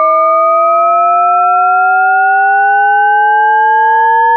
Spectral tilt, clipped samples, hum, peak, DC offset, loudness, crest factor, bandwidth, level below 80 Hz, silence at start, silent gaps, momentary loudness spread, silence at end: 2.5 dB/octave; under 0.1%; none; -2 dBFS; under 0.1%; -8 LUFS; 6 dB; 4.3 kHz; under -90 dBFS; 0 s; none; 0 LU; 0 s